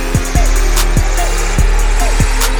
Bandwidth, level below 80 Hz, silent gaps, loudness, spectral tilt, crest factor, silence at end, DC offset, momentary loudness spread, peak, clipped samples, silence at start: over 20 kHz; -12 dBFS; none; -15 LUFS; -4 dB/octave; 10 dB; 0 s; under 0.1%; 2 LU; 0 dBFS; under 0.1%; 0 s